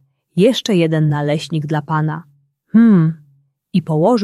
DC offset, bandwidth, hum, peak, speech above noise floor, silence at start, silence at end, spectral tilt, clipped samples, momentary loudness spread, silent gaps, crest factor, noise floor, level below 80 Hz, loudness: under 0.1%; 12.5 kHz; none; -2 dBFS; 42 dB; 0.35 s; 0 s; -7 dB/octave; under 0.1%; 11 LU; none; 14 dB; -56 dBFS; -60 dBFS; -16 LUFS